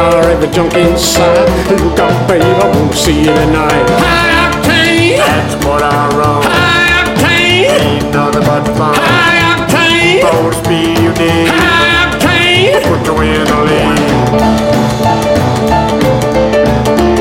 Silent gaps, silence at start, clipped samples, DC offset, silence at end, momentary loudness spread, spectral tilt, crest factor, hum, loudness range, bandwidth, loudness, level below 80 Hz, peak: none; 0 s; under 0.1%; under 0.1%; 0 s; 4 LU; -4.5 dB/octave; 8 dB; none; 2 LU; 16.5 kHz; -9 LUFS; -24 dBFS; 0 dBFS